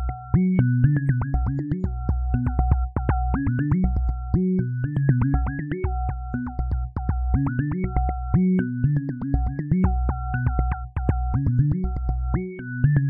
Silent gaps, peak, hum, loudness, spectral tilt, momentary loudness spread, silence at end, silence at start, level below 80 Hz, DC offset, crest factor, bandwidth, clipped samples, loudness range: none; -4 dBFS; none; -24 LUFS; -12.5 dB/octave; 7 LU; 0 s; 0 s; -28 dBFS; under 0.1%; 18 dB; 3.1 kHz; under 0.1%; 2 LU